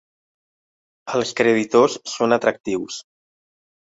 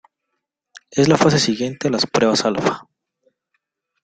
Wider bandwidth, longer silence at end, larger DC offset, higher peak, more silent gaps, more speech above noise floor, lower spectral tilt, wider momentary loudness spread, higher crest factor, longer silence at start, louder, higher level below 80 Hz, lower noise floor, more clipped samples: second, 8 kHz vs 9.4 kHz; second, 0.95 s vs 1.2 s; neither; about the same, -2 dBFS vs 0 dBFS; first, 2.60-2.64 s vs none; first, over 71 dB vs 60 dB; about the same, -4 dB/octave vs -4.5 dB/octave; first, 15 LU vs 8 LU; about the same, 20 dB vs 20 dB; first, 1.05 s vs 0.75 s; second, -20 LUFS vs -17 LUFS; second, -64 dBFS vs -56 dBFS; first, under -90 dBFS vs -77 dBFS; neither